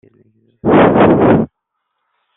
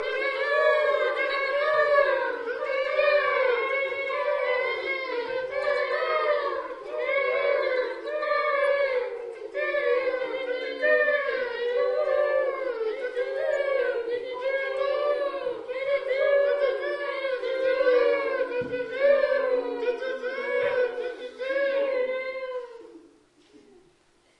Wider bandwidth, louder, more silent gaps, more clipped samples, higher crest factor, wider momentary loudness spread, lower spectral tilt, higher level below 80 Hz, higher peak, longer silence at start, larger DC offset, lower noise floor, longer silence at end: second, 4 kHz vs 8.8 kHz; first, -11 LUFS vs -26 LUFS; neither; neither; second, 12 dB vs 18 dB; first, 12 LU vs 9 LU; first, -6.5 dB/octave vs -3.5 dB/octave; first, -40 dBFS vs -66 dBFS; first, 0 dBFS vs -10 dBFS; first, 0.65 s vs 0 s; neither; first, -72 dBFS vs -63 dBFS; second, 0.9 s vs 1.4 s